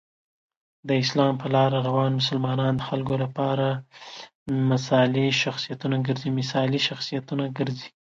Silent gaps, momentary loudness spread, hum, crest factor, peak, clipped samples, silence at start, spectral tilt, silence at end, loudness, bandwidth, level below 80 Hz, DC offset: 4.35-4.46 s; 9 LU; none; 18 dB; -8 dBFS; under 0.1%; 0.85 s; -6 dB/octave; 0.3 s; -24 LUFS; 7.6 kHz; -62 dBFS; under 0.1%